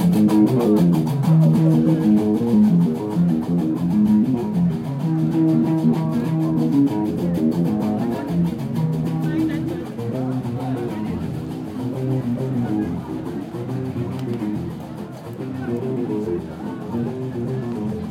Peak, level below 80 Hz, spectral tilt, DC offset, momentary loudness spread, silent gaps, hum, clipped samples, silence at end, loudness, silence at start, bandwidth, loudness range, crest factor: -6 dBFS; -52 dBFS; -9 dB/octave; under 0.1%; 12 LU; none; none; under 0.1%; 0 s; -21 LUFS; 0 s; 15.5 kHz; 9 LU; 14 dB